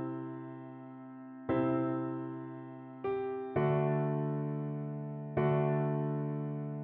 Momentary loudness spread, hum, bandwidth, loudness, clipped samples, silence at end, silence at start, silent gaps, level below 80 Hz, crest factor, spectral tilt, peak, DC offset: 16 LU; none; 3.8 kHz; -35 LUFS; under 0.1%; 0 s; 0 s; none; -68 dBFS; 16 dB; -9 dB/octave; -20 dBFS; under 0.1%